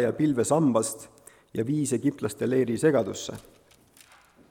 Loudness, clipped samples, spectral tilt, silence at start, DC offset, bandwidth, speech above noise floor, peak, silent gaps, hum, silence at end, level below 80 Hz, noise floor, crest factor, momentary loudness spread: -26 LUFS; under 0.1%; -5.5 dB/octave; 0 s; under 0.1%; 17 kHz; 31 dB; -10 dBFS; none; none; 1.1 s; -64 dBFS; -57 dBFS; 18 dB; 15 LU